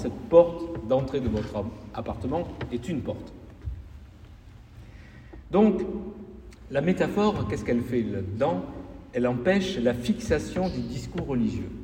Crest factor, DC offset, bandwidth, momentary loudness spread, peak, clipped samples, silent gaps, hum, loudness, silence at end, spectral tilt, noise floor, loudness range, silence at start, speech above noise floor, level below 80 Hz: 22 dB; under 0.1%; 16 kHz; 20 LU; -6 dBFS; under 0.1%; none; none; -27 LUFS; 0 s; -7 dB/octave; -48 dBFS; 8 LU; 0 s; 22 dB; -44 dBFS